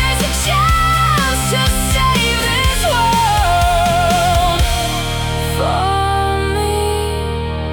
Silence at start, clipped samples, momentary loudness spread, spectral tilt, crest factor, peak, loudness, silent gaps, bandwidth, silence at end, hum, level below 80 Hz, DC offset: 0 s; under 0.1%; 6 LU; -4 dB/octave; 12 dB; -2 dBFS; -15 LUFS; none; 17.5 kHz; 0 s; none; -22 dBFS; under 0.1%